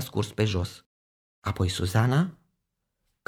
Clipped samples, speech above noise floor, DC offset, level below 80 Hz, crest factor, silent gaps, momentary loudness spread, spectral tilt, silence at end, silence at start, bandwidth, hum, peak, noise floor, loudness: under 0.1%; 54 dB; under 0.1%; -50 dBFS; 20 dB; 0.86-1.42 s; 11 LU; -6 dB/octave; 0.95 s; 0 s; 16.5 kHz; none; -10 dBFS; -80 dBFS; -27 LUFS